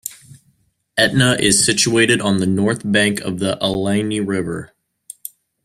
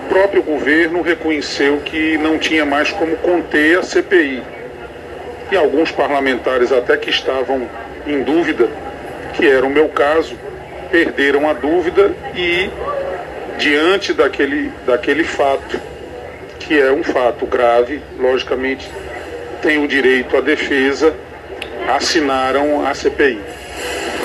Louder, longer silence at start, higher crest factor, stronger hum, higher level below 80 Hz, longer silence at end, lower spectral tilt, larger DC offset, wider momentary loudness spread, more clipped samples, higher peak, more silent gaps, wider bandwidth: about the same, -16 LUFS vs -15 LUFS; about the same, 0.05 s vs 0 s; about the same, 18 dB vs 16 dB; neither; second, -50 dBFS vs -44 dBFS; first, 1 s vs 0 s; about the same, -3.5 dB/octave vs -4 dB/octave; neither; first, 18 LU vs 15 LU; neither; about the same, 0 dBFS vs 0 dBFS; neither; first, 15.5 kHz vs 12.5 kHz